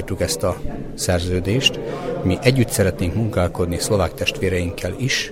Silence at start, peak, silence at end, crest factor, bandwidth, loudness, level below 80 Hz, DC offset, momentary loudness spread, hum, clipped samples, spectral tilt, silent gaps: 0 s; 0 dBFS; 0 s; 20 dB; 16 kHz; -20 LUFS; -36 dBFS; under 0.1%; 8 LU; none; under 0.1%; -4.5 dB/octave; none